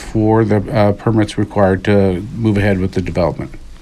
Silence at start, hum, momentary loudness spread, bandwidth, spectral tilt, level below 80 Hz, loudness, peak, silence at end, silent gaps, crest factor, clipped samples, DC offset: 0 s; none; 5 LU; 11 kHz; -8 dB/octave; -34 dBFS; -15 LUFS; 0 dBFS; 0 s; none; 14 dB; under 0.1%; under 0.1%